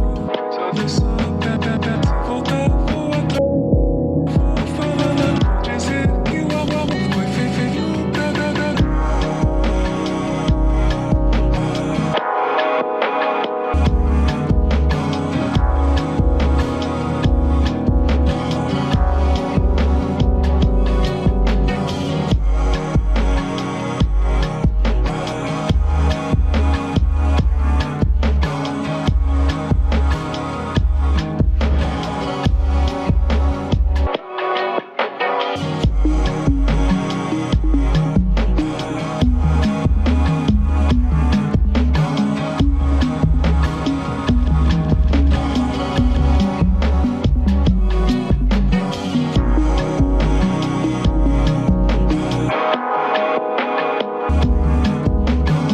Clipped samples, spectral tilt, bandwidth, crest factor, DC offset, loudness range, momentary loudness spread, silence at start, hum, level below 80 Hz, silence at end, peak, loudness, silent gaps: under 0.1%; -7 dB/octave; 8.8 kHz; 12 dB; under 0.1%; 2 LU; 4 LU; 0 s; none; -20 dBFS; 0 s; -4 dBFS; -18 LUFS; none